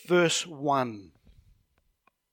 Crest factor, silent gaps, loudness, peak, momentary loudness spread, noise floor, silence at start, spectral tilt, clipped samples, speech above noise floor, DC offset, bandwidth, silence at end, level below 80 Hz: 18 dB; none; -27 LUFS; -12 dBFS; 13 LU; -71 dBFS; 0.1 s; -4 dB/octave; under 0.1%; 45 dB; under 0.1%; 16.5 kHz; 1.25 s; -66 dBFS